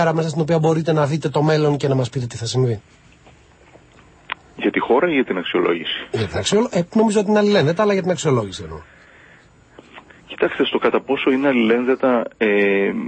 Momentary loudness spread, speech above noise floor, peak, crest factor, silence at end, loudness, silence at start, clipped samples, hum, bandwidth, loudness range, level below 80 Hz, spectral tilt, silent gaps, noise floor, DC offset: 8 LU; 31 dB; -2 dBFS; 18 dB; 0 s; -18 LUFS; 0 s; under 0.1%; none; 8.8 kHz; 5 LU; -54 dBFS; -6 dB/octave; none; -49 dBFS; under 0.1%